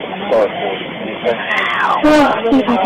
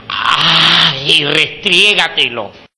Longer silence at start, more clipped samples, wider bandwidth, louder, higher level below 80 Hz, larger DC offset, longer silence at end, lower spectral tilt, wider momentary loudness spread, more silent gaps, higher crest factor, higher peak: about the same, 0 s vs 0.05 s; second, under 0.1% vs 0.8%; first, 15 kHz vs 11 kHz; second, -14 LUFS vs -9 LUFS; first, -42 dBFS vs -48 dBFS; neither; second, 0 s vs 0.2 s; first, -5 dB/octave vs -2.5 dB/octave; first, 10 LU vs 7 LU; neither; about the same, 10 dB vs 12 dB; second, -4 dBFS vs 0 dBFS